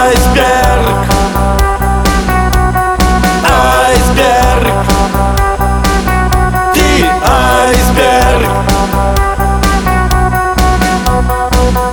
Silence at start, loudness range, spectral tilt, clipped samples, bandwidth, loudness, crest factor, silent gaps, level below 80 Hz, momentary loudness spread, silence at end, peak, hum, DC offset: 0 s; 1 LU; -5 dB/octave; under 0.1%; 20 kHz; -10 LUFS; 8 dB; none; -14 dBFS; 3 LU; 0 s; 0 dBFS; none; under 0.1%